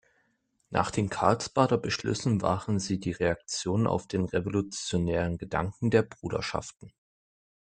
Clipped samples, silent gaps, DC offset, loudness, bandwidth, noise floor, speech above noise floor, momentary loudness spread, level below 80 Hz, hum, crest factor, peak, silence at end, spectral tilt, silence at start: under 0.1%; none; under 0.1%; -29 LUFS; 9.4 kHz; -73 dBFS; 45 dB; 6 LU; -54 dBFS; none; 22 dB; -6 dBFS; 0.75 s; -5.5 dB/octave; 0.7 s